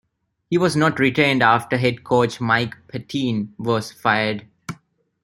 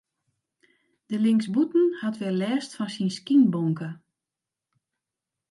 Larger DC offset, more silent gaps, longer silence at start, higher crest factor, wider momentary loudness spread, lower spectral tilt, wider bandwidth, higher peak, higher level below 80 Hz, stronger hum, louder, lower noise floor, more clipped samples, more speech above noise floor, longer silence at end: neither; neither; second, 0.5 s vs 1.1 s; about the same, 20 dB vs 16 dB; first, 16 LU vs 12 LU; second, -5.5 dB/octave vs -7 dB/octave; first, 16 kHz vs 11.5 kHz; first, -2 dBFS vs -10 dBFS; first, -58 dBFS vs -78 dBFS; neither; first, -20 LUFS vs -25 LUFS; second, -54 dBFS vs -88 dBFS; neither; second, 35 dB vs 65 dB; second, 0.5 s vs 1.55 s